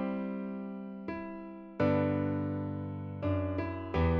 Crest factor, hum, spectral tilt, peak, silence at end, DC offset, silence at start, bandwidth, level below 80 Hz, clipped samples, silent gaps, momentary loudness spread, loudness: 16 dB; none; -10 dB/octave; -18 dBFS; 0 s; under 0.1%; 0 s; 5.8 kHz; -48 dBFS; under 0.1%; none; 12 LU; -35 LUFS